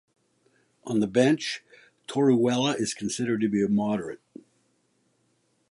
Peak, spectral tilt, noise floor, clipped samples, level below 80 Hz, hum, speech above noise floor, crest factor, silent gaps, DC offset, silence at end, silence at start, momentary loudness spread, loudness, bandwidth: -8 dBFS; -5 dB/octave; -70 dBFS; under 0.1%; -68 dBFS; none; 45 dB; 20 dB; none; under 0.1%; 1.55 s; 0.85 s; 16 LU; -25 LUFS; 11.5 kHz